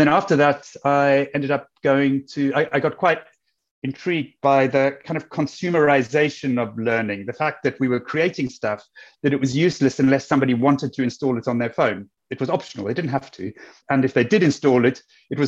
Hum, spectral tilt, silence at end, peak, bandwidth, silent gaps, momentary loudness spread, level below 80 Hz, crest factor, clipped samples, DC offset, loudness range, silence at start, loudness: none; -6.5 dB/octave; 0 s; -4 dBFS; 7.8 kHz; 3.71-3.82 s; 10 LU; -62 dBFS; 16 dB; under 0.1%; under 0.1%; 3 LU; 0 s; -21 LUFS